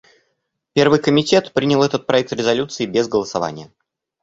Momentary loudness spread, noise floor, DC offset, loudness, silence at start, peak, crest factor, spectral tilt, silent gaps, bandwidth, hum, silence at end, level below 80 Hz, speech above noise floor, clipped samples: 9 LU; -72 dBFS; under 0.1%; -18 LUFS; 0.75 s; -2 dBFS; 18 dB; -5 dB/octave; none; 8 kHz; none; 0.55 s; -54 dBFS; 55 dB; under 0.1%